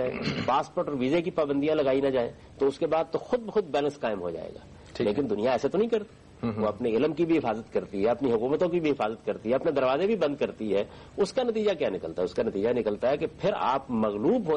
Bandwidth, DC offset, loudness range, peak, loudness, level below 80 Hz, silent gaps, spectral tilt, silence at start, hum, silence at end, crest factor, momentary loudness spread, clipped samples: 9.6 kHz; under 0.1%; 2 LU; -16 dBFS; -28 LUFS; -58 dBFS; none; -6.5 dB/octave; 0 s; none; 0 s; 12 dB; 6 LU; under 0.1%